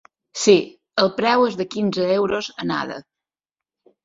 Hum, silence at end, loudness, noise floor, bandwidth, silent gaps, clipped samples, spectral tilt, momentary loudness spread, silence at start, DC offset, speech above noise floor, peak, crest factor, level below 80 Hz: none; 1.05 s; -20 LUFS; -89 dBFS; 7.8 kHz; none; under 0.1%; -4 dB/octave; 10 LU; 0.35 s; under 0.1%; 70 dB; -2 dBFS; 20 dB; -62 dBFS